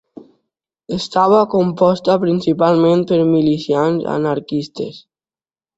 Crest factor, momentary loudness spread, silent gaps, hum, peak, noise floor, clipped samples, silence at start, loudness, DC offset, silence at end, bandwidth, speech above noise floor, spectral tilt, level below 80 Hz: 14 dB; 11 LU; none; none; -2 dBFS; under -90 dBFS; under 0.1%; 0.9 s; -15 LUFS; under 0.1%; 0.8 s; 8 kHz; over 75 dB; -7.5 dB/octave; -56 dBFS